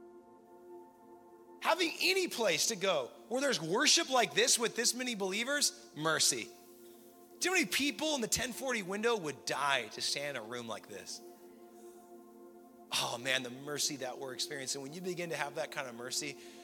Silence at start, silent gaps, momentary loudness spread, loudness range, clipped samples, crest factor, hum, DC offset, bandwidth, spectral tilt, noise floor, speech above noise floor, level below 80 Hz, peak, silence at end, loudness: 0 s; none; 13 LU; 8 LU; under 0.1%; 22 dB; none; under 0.1%; 17.5 kHz; -1.5 dB/octave; -57 dBFS; 23 dB; -74 dBFS; -14 dBFS; 0 s; -33 LUFS